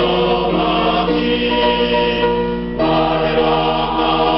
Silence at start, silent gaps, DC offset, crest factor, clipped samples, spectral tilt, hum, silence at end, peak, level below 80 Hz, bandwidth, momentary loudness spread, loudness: 0 s; none; 0.2%; 10 dB; under 0.1%; -3 dB/octave; none; 0 s; -4 dBFS; -34 dBFS; 5.8 kHz; 2 LU; -16 LUFS